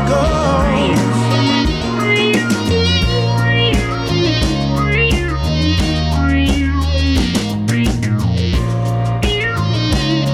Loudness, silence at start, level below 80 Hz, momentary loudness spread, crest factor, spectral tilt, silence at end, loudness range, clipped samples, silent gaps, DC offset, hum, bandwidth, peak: -15 LUFS; 0 s; -22 dBFS; 4 LU; 12 dB; -5.5 dB/octave; 0 s; 2 LU; under 0.1%; none; under 0.1%; none; 14.5 kHz; -2 dBFS